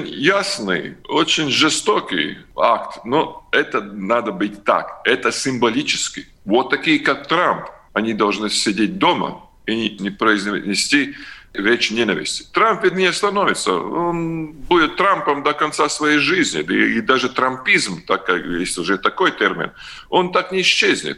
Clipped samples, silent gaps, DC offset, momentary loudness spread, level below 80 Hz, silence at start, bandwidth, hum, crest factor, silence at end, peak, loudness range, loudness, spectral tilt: under 0.1%; none; under 0.1%; 8 LU; -50 dBFS; 0 s; 12.5 kHz; none; 18 dB; 0 s; 0 dBFS; 2 LU; -18 LUFS; -3 dB/octave